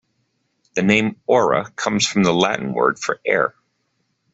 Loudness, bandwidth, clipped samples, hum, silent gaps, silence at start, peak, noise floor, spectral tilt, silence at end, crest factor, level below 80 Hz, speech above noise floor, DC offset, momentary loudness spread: -19 LUFS; 8 kHz; under 0.1%; none; none; 0.75 s; -2 dBFS; -70 dBFS; -4.5 dB/octave; 0.85 s; 18 dB; -58 dBFS; 51 dB; under 0.1%; 6 LU